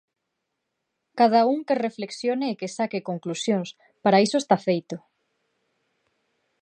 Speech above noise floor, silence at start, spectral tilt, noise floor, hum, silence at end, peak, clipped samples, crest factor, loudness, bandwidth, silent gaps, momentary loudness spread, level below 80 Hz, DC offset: 57 dB; 1.15 s; -5 dB/octave; -80 dBFS; none; 1.65 s; -4 dBFS; under 0.1%; 22 dB; -24 LUFS; 10.5 kHz; none; 11 LU; -78 dBFS; under 0.1%